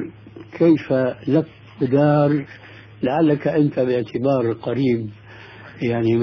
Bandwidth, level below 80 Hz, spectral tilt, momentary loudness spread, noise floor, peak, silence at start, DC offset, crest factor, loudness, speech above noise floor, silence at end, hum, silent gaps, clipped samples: 5.4 kHz; -56 dBFS; -9.5 dB/octave; 19 LU; -40 dBFS; -6 dBFS; 0 s; under 0.1%; 14 dB; -20 LUFS; 22 dB; 0 s; none; none; under 0.1%